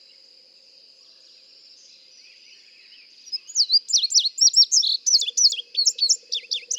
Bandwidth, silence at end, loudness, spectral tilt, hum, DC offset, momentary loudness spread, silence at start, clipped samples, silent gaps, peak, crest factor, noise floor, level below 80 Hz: 17.5 kHz; 0 s; -17 LUFS; 7 dB/octave; none; under 0.1%; 11 LU; 3.3 s; under 0.1%; none; -6 dBFS; 18 dB; -52 dBFS; under -90 dBFS